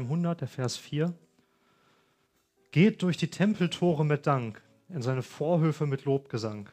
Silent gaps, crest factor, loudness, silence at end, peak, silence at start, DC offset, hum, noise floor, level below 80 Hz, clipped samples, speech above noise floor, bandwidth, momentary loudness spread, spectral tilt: none; 20 dB; -29 LUFS; 0.05 s; -10 dBFS; 0 s; under 0.1%; none; -71 dBFS; -72 dBFS; under 0.1%; 44 dB; 10.5 kHz; 10 LU; -7 dB/octave